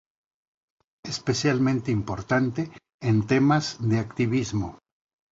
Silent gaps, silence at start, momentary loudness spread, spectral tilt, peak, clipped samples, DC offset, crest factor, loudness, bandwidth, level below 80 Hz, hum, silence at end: 2.94-2.99 s; 1.05 s; 12 LU; -6 dB/octave; -8 dBFS; under 0.1%; under 0.1%; 18 dB; -25 LUFS; 7.8 kHz; -52 dBFS; none; 0.55 s